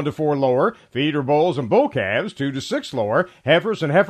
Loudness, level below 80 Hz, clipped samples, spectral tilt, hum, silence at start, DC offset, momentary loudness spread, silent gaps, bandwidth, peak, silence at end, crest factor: -20 LUFS; -60 dBFS; under 0.1%; -6.5 dB/octave; none; 0 s; under 0.1%; 6 LU; none; 13.5 kHz; -2 dBFS; 0 s; 16 dB